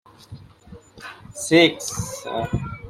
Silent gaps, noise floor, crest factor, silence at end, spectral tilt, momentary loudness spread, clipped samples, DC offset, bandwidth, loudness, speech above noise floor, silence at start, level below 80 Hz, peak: none; -46 dBFS; 24 dB; 0 s; -4 dB/octave; 24 LU; under 0.1%; under 0.1%; 15.5 kHz; -21 LUFS; 26 dB; 0.3 s; -46 dBFS; 0 dBFS